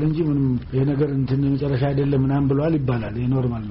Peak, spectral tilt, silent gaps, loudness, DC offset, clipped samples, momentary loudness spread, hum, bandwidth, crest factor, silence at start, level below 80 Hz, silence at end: -10 dBFS; -9 dB/octave; none; -21 LUFS; under 0.1%; under 0.1%; 3 LU; none; 5.6 kHz; 10 dB; 0 s; -40 dBFS; 0 s